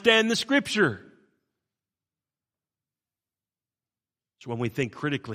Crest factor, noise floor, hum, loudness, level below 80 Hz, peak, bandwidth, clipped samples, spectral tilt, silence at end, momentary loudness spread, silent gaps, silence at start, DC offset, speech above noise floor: 26 dB; under -90 dBFS; none; -25 LUFS; -68 dBFS; -4 dBFS; 15 kHz; under 0.1%; -4 dB/octave; 0 s; 17 LU; none; 0 s; under 0.1%; over 65 dB